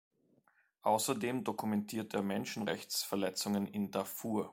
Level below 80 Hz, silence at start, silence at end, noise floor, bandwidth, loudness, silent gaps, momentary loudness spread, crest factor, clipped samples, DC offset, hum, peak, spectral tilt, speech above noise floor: -78 dBFS; 0.85 s; 0 s; -73 dBFS; 17 kHz; -36 LUFS; none; 6 LU; 18 dB; under 0.1%; under 0.1%; none; -18 dBFS; -4 dB/octave; 37 dB